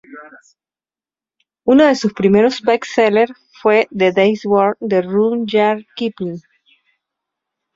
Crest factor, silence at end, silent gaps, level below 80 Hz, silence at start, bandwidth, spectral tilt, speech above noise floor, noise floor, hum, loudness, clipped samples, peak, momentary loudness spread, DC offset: 16 dB; 1.35 s; none; -58 dBFS; 0.1 s; 7.8 kHz; -6 dB/octave; over 75 dB; under -90 dBFS; none; -15 LUFS; under 0.1%; -2 dBFS; 10 LU; under 0.1%